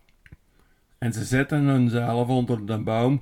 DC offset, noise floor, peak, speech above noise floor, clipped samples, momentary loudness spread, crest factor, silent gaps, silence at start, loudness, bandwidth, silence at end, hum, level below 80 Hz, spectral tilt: under 0.1%; -61 dBFS; -8 dBFS; 38 dB; under 0.1%; 8 LU; 16 dB; none; 0.3 s; -24 LUFS; 15 kHz; 0 s; none; -52 dBFS; -7 dB/octave